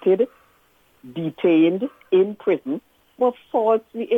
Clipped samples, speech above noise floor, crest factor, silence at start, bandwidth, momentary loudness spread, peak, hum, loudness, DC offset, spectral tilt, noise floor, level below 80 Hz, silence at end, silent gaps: under 0.1%; 39 dB; 14 dB; 0 s; 3.8 kHz; 12 LU; -8 dBFS; none; -21 LUFS; under 0.1%; -8.5 dB/octave; -59 dBFS; -70 dBFS; 0 s; none